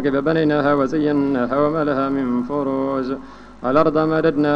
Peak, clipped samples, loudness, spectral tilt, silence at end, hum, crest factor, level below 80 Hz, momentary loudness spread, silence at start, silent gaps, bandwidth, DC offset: -2 dBFS; under 0.1%; -19 LUFS; -8.5 dB/octave; 0 s; none; 16 dB; -48 dBFS; 6 LU; 0 s; none; 6.8 kHz; under 0.1%